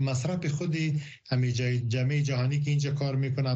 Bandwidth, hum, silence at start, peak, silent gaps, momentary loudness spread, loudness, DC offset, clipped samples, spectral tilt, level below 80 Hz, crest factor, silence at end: 8.2 kHz; none; 0 s; -14 dBFS; none; 3 LU; -28 LUFS; under 0.1%; under 0.1%; -6.5 dB/octave; -60 dBFS; 12 dB; 0 s